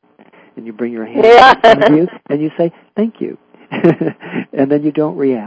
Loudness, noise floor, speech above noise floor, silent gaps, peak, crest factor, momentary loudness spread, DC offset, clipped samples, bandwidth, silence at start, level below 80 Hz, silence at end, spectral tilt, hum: -12 LUFS; -45 dBFS; 34 dB; none; 0 dBFS; 12 dB; 19 LU; under 0.1%; 2%; 8 kHz; 0.55 s; -50 dBFS; 0 s; -6.5 dB/octave; none